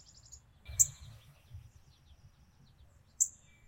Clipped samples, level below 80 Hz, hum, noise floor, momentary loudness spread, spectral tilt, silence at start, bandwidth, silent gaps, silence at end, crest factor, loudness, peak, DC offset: under 0.1%; -60 dBFS; none; -63 dBFS; 27 LU; -0.5 dB/octave; 0.3 s; 16 kHz; none; 0.4 s; 30 dB; -31 LUFS; -10 dBFS; under 0.1%